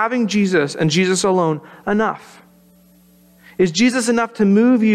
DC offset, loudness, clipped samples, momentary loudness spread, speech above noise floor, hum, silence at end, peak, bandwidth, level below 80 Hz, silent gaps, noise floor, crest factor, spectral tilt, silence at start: under 0.1%; -17 LUFS; under 0.1%; 8 LU; 34 dB; none; 0 s; -4 dBFS; 13 kHz; -58 dBFS; none; -50 dBFS; 12 dB; -5 dB/octave; 0 s